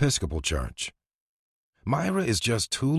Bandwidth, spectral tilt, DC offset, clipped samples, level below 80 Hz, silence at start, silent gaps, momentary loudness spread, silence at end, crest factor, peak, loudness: 14 kHz; -4.5 dB/octave; under 0.1%; under 0.1%; -40 dBFS; 0 s; 1.15-1.73 s; 10 LU; 0 s; 16 dB; -12 dBFS; -27 LUFS